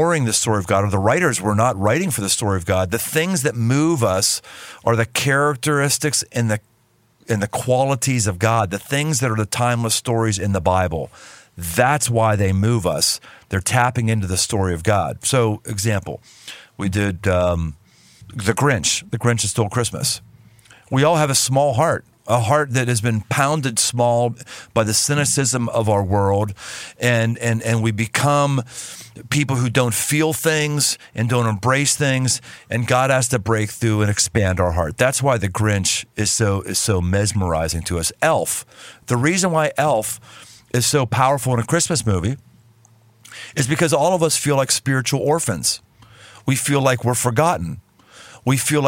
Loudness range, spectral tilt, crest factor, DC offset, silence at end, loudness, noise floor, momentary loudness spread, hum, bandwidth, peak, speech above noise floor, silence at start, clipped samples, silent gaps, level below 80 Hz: 2 LU; -4 dB/octave; 16 dB; under 0.1%; 0 s; -19 LUFS; -59 dBFS; 8 LU; none; 16.5 kHz; -2 dBFS; 40 dB; 0 s; under 0.1%; none; -44 dBFS